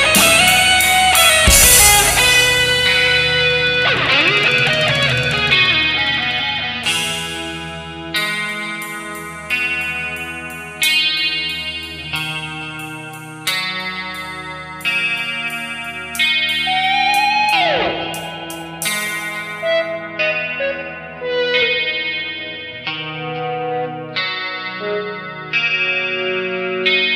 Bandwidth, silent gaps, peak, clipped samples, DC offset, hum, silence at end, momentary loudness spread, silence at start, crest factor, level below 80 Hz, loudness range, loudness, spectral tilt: 15.5 kHz; none; 0 dBFS; under 0.1%; under 0.1%; none; 0 s; 16 LU; 0 s; 18 dB; -36 dBFS; 11 LU; -15 LUFS; -1.5 dB/octave